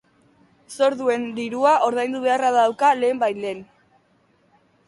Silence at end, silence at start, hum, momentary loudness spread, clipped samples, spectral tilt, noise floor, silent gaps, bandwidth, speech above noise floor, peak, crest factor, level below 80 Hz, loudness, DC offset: 1.25 s; 0.7 s; none; 12 LU; under 0.1%; -4 dB/octave; -61 dBFS; none; 11.5 kHz; 41 dB; -4 dBFS; 18 dB; -70 dBFS; -20 LUFS; under 0.1%